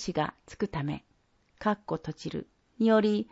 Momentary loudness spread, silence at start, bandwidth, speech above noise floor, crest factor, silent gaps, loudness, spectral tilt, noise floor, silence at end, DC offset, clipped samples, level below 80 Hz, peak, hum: 14 LU; 0 s; 8 kHz; 38 dB; 20 dB; none; -30 LUFS; -6.5 dB/octave; -68 dBFS; 0.1 s; under 0.1%; under 0.1%; -58 dBFS; -12 dBFS; none